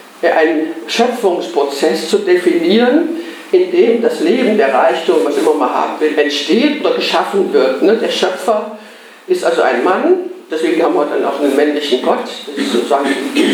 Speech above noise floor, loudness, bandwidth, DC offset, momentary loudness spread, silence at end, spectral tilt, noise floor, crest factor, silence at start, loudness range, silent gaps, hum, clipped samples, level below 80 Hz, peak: 24 dB; -13 LUFS; 19 kHz; under 0.1%; 5 LU; 0 s; -4 dB/octave; -37 dBFS; 12 dB; 0 s; 2 LU; none; none; under 0.1%; -76 dBFS; 0 dBFS